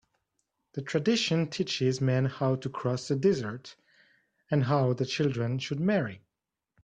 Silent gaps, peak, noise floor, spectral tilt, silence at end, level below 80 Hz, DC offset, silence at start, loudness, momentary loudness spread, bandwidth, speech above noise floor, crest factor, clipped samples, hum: none; -12 dBFS; -87 dBFS; -6 dB/octave; 0.65 s; -66 dBFS; under 0.1%; 0.75 s; -29 LUFS; 6 LU; 9.2 kHz; 59 dB; 18 dB; under 0.1%; none